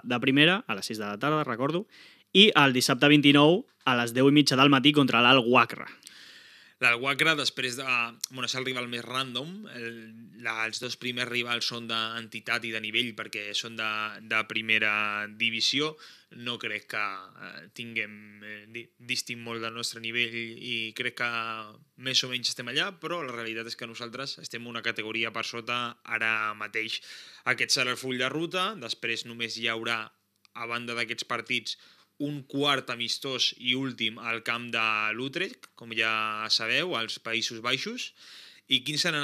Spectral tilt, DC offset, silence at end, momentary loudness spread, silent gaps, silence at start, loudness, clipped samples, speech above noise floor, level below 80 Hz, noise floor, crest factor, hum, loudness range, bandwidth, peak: -3.5 dB/octave; under 0.1%; 0 s; 16 LU; none; 0.05 s; -27 LUFS; under 0.1%; 25 dB; under -90 dBFS; -53 dBFS; 26 dB; none; 10 LU; 15 kHz; -2 dBFS